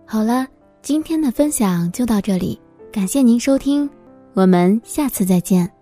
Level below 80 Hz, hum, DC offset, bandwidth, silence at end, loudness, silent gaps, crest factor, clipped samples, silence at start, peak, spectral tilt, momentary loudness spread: -46 dBFS; none; under 0.1%; 16 kHz; 0.15 s; -17 LUFS; none; 16 dB; under 0.1%; 0.1 s; 0 dBFS; -6 dB/octave; 12 LU